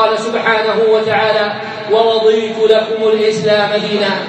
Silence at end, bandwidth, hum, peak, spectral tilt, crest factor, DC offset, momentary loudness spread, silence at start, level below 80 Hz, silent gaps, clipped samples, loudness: 0 s; 8.6 kHz; none; 0 dBFS; -4.5 dB/octave; 12 dB; under 0.1%; 3 LU; 0 s; -64 dBFS; none; under 0.1%; -13 LUFS